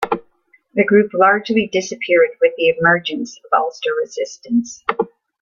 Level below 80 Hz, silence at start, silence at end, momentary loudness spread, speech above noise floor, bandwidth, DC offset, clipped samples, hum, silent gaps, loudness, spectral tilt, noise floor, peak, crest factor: -60 dBFS; 0 s; 0.35 s; 11 LU; 40 dB; 7.4 kHz; under 0.1%; under 0.1%; none; none; -17 LUFS; -4.5 dB/octave; -57 dBFS; 0 dBFS; 18 dB